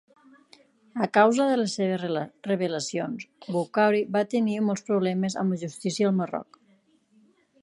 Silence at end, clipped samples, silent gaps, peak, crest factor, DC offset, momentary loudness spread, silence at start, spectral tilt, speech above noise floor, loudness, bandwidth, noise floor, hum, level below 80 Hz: 1.2 s; under 0.1%; none; -6 dBFS; 22 dB; under 0.1%; 11 LU; 0.95 s; -5.5 dB/octave; 38 dB; -26 LUFS; 11.5 kHz; -63 dBFS; none; -76 dBFS